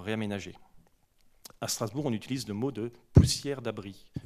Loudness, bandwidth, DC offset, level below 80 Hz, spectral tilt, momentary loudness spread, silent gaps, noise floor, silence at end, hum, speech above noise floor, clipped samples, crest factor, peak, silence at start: -30 LUFS; 14.5 kHz; under 0.1%; -44 dBFS; -5.5 dB/octave; 16 LU; none; -64 dBFS; 0.05 s; none; 34 dB; under 0.1%; 24 dB; -6 dBFS; 0 s